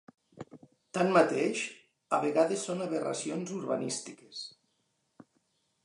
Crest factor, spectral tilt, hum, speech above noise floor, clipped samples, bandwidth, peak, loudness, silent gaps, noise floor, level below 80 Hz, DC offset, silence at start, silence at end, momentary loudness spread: 22 dB; -4.5 dB/octave; none; 47 dB; under 0.1%; 11.5 kHz; -10 dBFS; -31 LUFS; none; -77 dBFS; -82 dBFS; under 0.1%; 0.35 s; 1.35 s; 20 LU